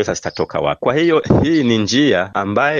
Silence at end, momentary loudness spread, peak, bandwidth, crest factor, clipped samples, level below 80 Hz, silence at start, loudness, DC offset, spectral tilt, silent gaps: 0 s; 7 LU; 0 dBFS; 7.4 kHz; 14 dB; under 0.1%; -40 dBFS; 0 s; -16 LUFS; under 0.1%; -5.5 dB/octave; none